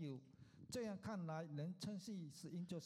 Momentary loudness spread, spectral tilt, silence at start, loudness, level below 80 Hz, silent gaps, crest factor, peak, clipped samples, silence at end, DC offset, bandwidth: 7 LU; -6 dB/octave; 0 s; -50 LUFS; -80 dBFS; none; 14 dB; -36 dBFS; under 0.1%; 0 s; under 0.1%; 15.5 kHz